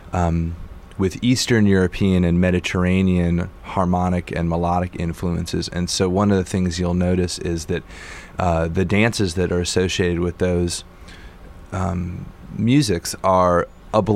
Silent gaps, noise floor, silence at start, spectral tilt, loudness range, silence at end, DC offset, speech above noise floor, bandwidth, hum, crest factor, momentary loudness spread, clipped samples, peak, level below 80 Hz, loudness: none; -40 dBFS; 0 s; -6 dB/octave; 4 LU; 0 s; under 0.1%; 20 dB; 14 kHz; none; 18 dB; 10 LU; under 0.1%; -2 dBFS; -38 dBFS; -20 LUFS